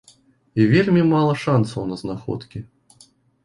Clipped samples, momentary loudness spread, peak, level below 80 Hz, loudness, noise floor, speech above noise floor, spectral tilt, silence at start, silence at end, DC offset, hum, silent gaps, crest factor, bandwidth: under 0.1%; 15 LU; -4 dBFS; -52 dBFS; -20 LUFS; -55 dBFS; 36 dB; -8 dB/octave; 0.55 s; 0.8 s; under 0.1%; none; none; 18 dB; 11.5 kHz